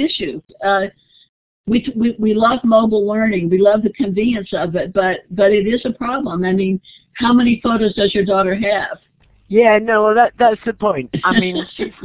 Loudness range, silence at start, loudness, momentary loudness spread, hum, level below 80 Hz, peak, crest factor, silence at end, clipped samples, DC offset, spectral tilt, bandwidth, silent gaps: 2 LU; 0 s; -16 LUFS; 9 LU; none; -46 dBFS; 0 dBFS; 14 dB; 0 s; under 0.1%; under 0.1%; -10 dB/octave; 4 kHz; 1.29-1.64 s